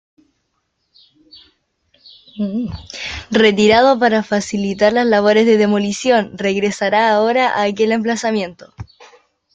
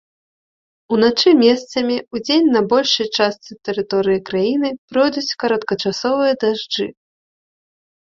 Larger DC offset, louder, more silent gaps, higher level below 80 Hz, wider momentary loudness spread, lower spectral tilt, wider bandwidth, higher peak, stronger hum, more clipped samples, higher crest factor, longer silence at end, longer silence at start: neither; about the same, -15 LUFS vs -17 LUFS; second, none vs 4.78-4.88 s; first, -50 dBFS vs -58 dBFS; first, 15 LU vs 9 LU; about the same, -4.5 dB/octave vs -4.5 dB/octave; first, 9.2 kHz vs 7.6 kHz; about the same, 0 dBFS vs -2 dBFS; neither; neither; about the same, 16 dB vs 16 dB; second, 0.7 s vs 1.2 s; first, 2.35 s vs 0.9 s